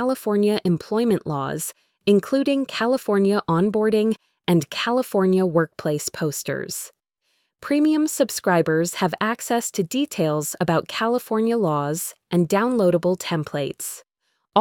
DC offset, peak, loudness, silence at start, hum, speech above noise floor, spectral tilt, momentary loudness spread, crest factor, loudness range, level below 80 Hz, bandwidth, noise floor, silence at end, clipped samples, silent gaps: under 0.1%; -2 dBFS; -22 LUFS; 0 s; none; 52 dB; -5 dB/octave; 8 LU; 20 dB; 2 LU; -62 dBFS; 19 kHz; -73 dBFS; 0 s; under 0.1%; none